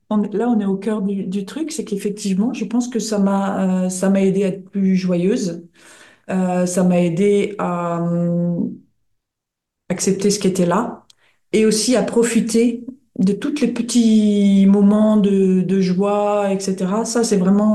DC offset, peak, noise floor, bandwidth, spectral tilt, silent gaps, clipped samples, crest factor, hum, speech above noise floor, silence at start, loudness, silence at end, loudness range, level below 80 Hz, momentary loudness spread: under 0.1%; -6 dBFS; -81 dBFS; 12.5 kHz; -6 dB/octave; none; under 0.1%; 12 dB; none; 65 dB; 0.1 s; -18 LUFS; 0 s; 6 LU; -60 dBFS; 9 LU